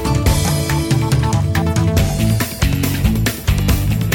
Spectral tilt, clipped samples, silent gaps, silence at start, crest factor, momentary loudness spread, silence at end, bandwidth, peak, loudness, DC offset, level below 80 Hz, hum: -5.5 dB/octave; under 0.1%; none; 0 s; 12 dB; 2 LU; 0 s; 19.5 kHz; -2 dBFS; -16 LUFS; under 0.1%; -22 dBFS; none